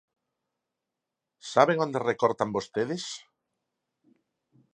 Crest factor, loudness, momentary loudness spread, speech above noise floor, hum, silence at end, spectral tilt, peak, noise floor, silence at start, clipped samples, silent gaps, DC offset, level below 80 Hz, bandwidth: 26 dB; -27 LUFS; 15 LU; 60 dB; none; 1.55 s; -5 dB/octave; -4 dBFS; -87 dBFS; 1.45 s; under 0.1%; none; under 0.1%; -72 dBFS; 10 kHz